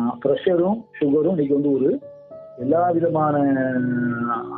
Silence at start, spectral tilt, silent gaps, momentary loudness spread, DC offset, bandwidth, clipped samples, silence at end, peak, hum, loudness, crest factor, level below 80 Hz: 0 s; -11.5 dB/octave; none; 10 LU; under 0.1%; 3.9 kHz; under 0.1%; 0 s; -6 dBFS; none; -21 LUFS; 14 dB; -62 dBFS